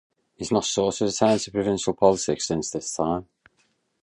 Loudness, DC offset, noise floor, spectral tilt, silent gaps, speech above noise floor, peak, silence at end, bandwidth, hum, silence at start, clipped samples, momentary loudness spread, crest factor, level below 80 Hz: -24 LUFS; under 0.1%; -69 dBFS; -4.5 dB/octave; none; 45 dB; -4 dBFS; 0.8 s; 11.5 kHz; none; 0.4 s; under 0.1%; 7 LU; 22 dB; -54 dBFS